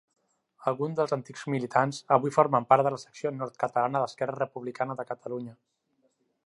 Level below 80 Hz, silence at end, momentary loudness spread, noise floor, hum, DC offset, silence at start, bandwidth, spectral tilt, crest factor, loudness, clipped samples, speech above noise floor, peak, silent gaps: -78 dBFS; 0.95 s; 12 LU; -72 dBFS; none; under 0.1%; 0.6 s; 11.5 kHz; -6.5 dB/octave; 24 dB; -28 LUFS; under 0.1%; 45 dB; -6 dBFS; none